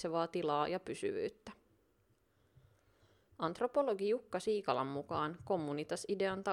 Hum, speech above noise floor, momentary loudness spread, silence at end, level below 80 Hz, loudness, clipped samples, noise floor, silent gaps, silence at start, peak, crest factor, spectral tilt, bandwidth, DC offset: none; 38 dB; 7 LU; 0 s; -74 dBFS; -38 LUFS; under 0.1%; -75 dBFS; none; 0 s; -18 dBFS; 20 dB; -5.5 dB/octave; 13.5 kHz; under 0.1%